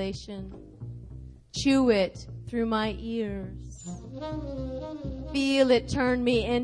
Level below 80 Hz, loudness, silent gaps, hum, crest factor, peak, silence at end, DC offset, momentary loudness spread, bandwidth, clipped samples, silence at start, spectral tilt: -44 dBFS; -27 LUFS; none; none; 20 dB; -8 dBFS; 0 s; under 0.1%; 20 LU; 10.5 kHz; under 0.1%; 0 s; -5.5 dB/octave